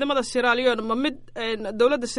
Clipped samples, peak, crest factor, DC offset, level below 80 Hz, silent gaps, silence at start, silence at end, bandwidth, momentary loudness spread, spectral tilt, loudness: under 0.1%; -8 dBFS; 16 dB; under 0.1%; -52 dBFS; none; 0 s; 0 s; 11.5 kHz; 8 LU; -3 dB/octave; -23 LUFS